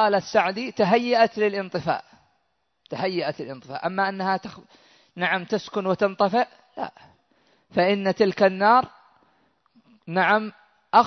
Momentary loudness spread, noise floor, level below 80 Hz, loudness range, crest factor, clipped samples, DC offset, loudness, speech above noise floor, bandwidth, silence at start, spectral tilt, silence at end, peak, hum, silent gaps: 15 LU; -73 dBFS; -68 dBFS; 6 LU; 20 dB; under 0.1%; under 0.1%; -23 LUFS; 50 dB; 6.4 kHz; 0 s; -6 dB/octave; 0 s; -4 dBFS; none; none